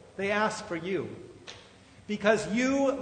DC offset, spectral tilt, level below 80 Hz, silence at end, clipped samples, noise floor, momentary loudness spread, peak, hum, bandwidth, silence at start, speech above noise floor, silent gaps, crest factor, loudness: under 0.1%; -4.5 dB/octave; -62 dBFS; 0 s; under 0.1%; -54 dBFS; 20 LU; -10 dBFS; none; 9.6 kHz; 0.05 s; 26 dB; none; 20 dB; -29 LUFS